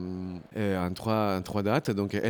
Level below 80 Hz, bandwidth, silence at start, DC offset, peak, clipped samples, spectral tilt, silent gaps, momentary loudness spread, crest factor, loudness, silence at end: -58 dBFS; 20 kHz; 0 s; under 0.1%; -12 dBFS; under 0.1%; -7 dB/octave; none; 9 LU; 16 dB; -30 LUFS; 0 s